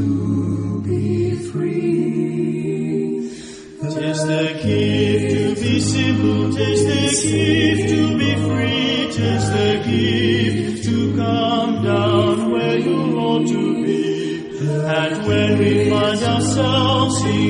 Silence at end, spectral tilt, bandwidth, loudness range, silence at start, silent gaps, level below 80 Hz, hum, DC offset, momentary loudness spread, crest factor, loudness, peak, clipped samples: 0 s; -5.5 dB/octave; 10.5 kHz; 4 LU; 0 s; none; -46 dBFS; none; under 0.1%; 6 LU; 14 dB; -18 LUFS; -4 dBFS; under 0.1%